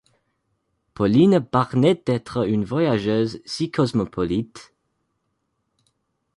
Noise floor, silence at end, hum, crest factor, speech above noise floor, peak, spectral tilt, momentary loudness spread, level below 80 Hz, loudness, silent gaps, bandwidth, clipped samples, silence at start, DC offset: -74 dBFS; 1.75 s; none; 18 dB; 53 dB; -6 dBFS; -7.5 dB/octave; 9 LU; -52 dBFS; -21 LUFS; none; 11.5 kHz; under 0.1%; 1 s; under 0.1%